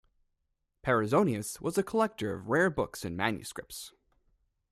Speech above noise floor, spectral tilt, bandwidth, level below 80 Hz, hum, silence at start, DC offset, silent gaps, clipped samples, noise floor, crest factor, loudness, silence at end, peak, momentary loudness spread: 50 dB; -5.5 dB/octave; 15.5 kHz; -60 dBFS; none; 0.85 s; under 0.1%; none; under 0.1%; -80 dBFS; 20 dB; -30 LUFS; 0.85 s; -12 dBFS; 14 LU